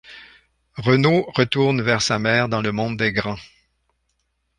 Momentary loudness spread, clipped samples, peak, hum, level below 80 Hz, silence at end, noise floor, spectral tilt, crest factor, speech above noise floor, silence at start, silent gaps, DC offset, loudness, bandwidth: 9 LU; under 0.1%; -2 dBFS; none; -52 dBFS; 1.15 s; -71 dBFS; -5 dB/octave; 20 dB; 52 dB; 0.1 s; none; under 0.1%; -19 LUFS; 10.5 kHz